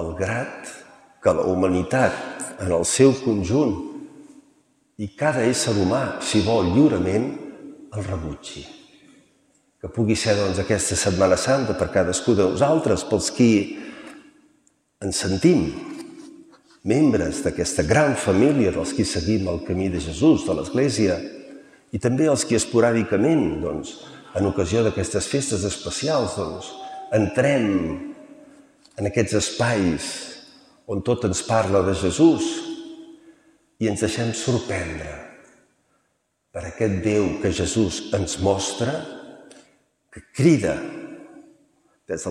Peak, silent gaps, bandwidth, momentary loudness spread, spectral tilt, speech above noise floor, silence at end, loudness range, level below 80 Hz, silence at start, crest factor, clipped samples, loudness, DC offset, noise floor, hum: -2 dBFS; none; 13.5 kHz; 18 LU; -5 dB/octave; 50 dB; 0 s; 6 LU; -46 dBFS; 0 s; 20 dB; under 0.1%; -21 LUFS; under 0.1%; -71 dBFS; none